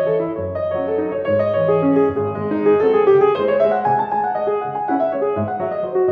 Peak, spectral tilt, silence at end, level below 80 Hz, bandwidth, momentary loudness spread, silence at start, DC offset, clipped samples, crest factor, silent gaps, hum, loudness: -4 dBFS; -9.5 dB/octave; 0 s; -58 dBFS; 4.8 kHz; 8 LU; 0 s; under 0.1%; under 0.1%; 14 dB; none; none; -18 LUFS